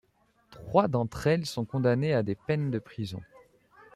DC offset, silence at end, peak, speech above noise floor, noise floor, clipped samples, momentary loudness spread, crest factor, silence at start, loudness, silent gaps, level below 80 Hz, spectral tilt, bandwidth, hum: under 0.1%; 0.7 s; -8 dBFS; 40 dB; -68 dBFS; under 0.1%; 12 LU; 22 dB; 0.5 s; -29 LUFS; none; -58 dBFS; -7 dB/octave; 14 kHz; none